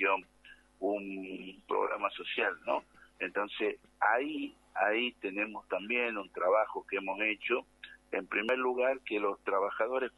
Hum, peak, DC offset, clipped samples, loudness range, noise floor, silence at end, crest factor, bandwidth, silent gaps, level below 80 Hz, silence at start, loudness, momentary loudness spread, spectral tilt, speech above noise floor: 50 Hz at -75 dBFS; -14 dBFS; under 0.1%; under 0.1%; 3 LU; -59 dBFS; 0.05 s; 20 dB; 11.5 kHz; none; -72 dBFS; 0 s; -33 LUFS; 9 LU; -5 dB/octave; 26 dB